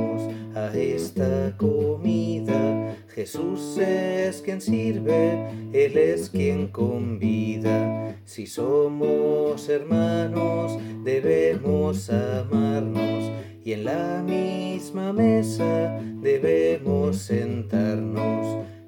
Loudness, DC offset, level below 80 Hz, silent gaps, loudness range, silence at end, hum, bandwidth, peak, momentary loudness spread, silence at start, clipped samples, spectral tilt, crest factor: -24 LUFS; under 0.1%; -60 dBFS; none; 2 LU; 0 s; none; 17 kHz; -8 dBFS; 9 LU; 0 s; under 0.1%; -7.5 dB/octave; 14 dB